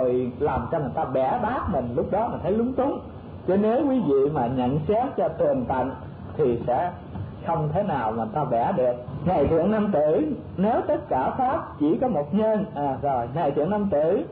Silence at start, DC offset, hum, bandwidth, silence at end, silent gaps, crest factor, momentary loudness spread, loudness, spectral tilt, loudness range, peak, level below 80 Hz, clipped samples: 0 s; under 0.1%; none; 4.7 kHz; 0 s; none; 10 dB; 6 LU; -24 LUFS; -12 dB/octave; 2 LU; -14 dBFS; -48 dBFS; under 0.1%